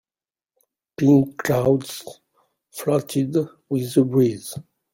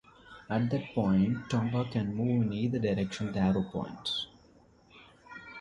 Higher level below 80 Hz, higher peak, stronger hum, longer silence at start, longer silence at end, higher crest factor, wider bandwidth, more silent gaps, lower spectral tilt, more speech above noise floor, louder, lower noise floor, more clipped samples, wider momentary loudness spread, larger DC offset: about the same, -58 dBFS vs -56 dBFS; first, -4 dBFS vs -16 dBFS; neither; first, 1 s vs 0.25 s; first, 0.35 s vs 0 s; about the same, 18 dB vs 16 dB; first, 16.5 kHz vs 11 kHz; neither; about the same, -7 dB/octave vs -7 dB/octave; first, over 70 dB vs 31 dB; first, -21 LUFS vs -31 LUFS; first, under -90 dBFS vs -61 dBFS; neither; first, 18 LU vs 12 LU; neither